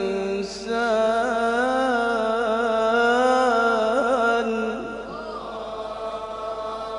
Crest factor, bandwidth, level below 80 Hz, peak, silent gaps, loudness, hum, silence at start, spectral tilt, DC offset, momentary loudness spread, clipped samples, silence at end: 14 dB; 11 kHz; -52 dBFS; -8 dBFS; none; -23 LUFS; none; 0 s; -4 dB/octave; under 0.1%; 13 LU; under 0.1%; 0 s